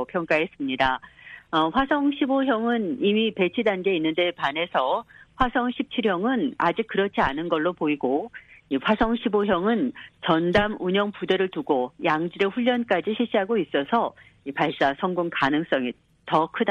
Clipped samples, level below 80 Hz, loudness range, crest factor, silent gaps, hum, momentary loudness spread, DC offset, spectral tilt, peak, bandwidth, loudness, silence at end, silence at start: under 0.1%; -50 dBFS; 1 LU; 16 dB; none; none; 5 LU; under 0.1%; -7 dB/octave; -8 dBFS; 7.8 kHz; -24 LUFS; 0 s; 0 s